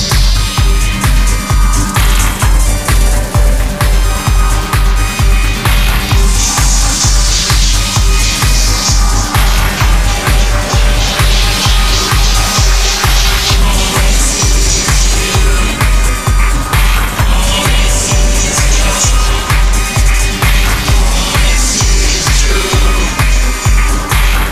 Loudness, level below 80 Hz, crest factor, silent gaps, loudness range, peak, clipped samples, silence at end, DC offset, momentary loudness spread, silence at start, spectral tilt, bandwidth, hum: -11 LUFS; -10 dBFS; 8 dB; none; 2 LU; 0 dBFS; under 0.1%; 0 s; under 0.1%; 3 LU; 0 s; -3 dB/octave; 15.5 kHz; none